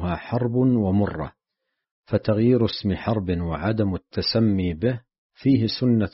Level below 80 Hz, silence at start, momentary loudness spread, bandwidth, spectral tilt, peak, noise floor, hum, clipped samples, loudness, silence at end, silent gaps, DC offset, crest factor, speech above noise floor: -46 dBFS; 0 s; 7 LU; 6 kHz; -6.5 dB/octave; -8 dBFS; -81 dBFS; none; under 0.1%; -23 LUFS; 0.05 s; 1.91-2.03 s, 5.18-5.30 s; under 0.1%; 16 dB; 59 dB